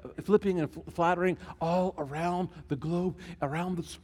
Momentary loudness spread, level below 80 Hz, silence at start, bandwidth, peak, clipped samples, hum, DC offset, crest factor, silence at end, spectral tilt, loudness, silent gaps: 9 LU; -56 dBFS; 0 s; 13 kHz; -10 dBFS; under 0.1%; none; under 0.1%; 20 dB; 0.05 s; -7 dB/octave; -31 LUFS; none